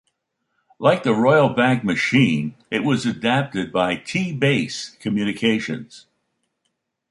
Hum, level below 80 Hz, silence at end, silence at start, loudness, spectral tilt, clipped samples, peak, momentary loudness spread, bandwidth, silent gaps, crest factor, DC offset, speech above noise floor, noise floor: none; -58 dBFS; 1.1 s; 0.8 s; -20 LUFS; -6 dB/octave; under 0.1%; -2 dBFS; 9 LU; 11.5 kHz; none; 18 dB; under 0.1%; 55 dB; -75 dBFS